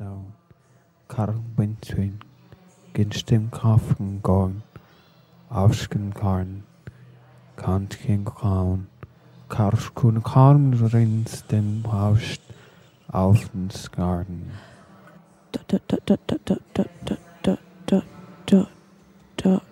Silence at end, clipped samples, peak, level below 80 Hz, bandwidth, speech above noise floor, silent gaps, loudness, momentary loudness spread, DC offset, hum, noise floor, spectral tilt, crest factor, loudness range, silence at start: 0.1 s; under 0.1%; -2 dBFS; -48 dBFS; 12.5 kHz; 37 dB; none; -23 LUFS; 15 LU; under 0.1%; none; -58 dBFS; -8 dB/octave; 22 dB; 7 LU; 0 s